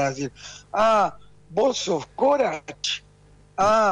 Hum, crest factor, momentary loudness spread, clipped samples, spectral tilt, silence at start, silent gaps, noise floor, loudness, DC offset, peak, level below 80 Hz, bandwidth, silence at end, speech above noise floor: 50 Hz at -55 dBFS; 12 dB; 13 LU; under 0.1%; -3.5 dB/octave; 0 s; none; -53 dBFS; -23 LUFS; under 0.1%; -12 dBFS; -54 dBFS; 10.5 kHz; 0 s; 31 dB